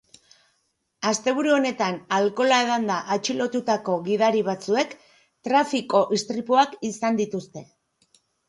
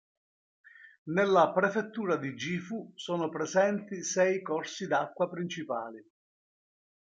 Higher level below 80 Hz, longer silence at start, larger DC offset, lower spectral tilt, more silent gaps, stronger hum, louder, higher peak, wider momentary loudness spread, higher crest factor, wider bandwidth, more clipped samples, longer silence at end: first, -72 dBFS vs -78 dBFS; first, 1 s vs 0.8 s; neither; about the same, -4 dB/octave vs -4.5 dB/octave; second, none vs 0.98-1.05 s; neither; first, -23 LUFS vs -30 LUFS; first, -6 dBFS vs -12 dBFS; second, 7 LU vs 12 LU; about the same, 18 dB vs 20 dB; first, 11.5 kHz vs 8.8 kHz; neither; second, 0.85 s vs 1.05 s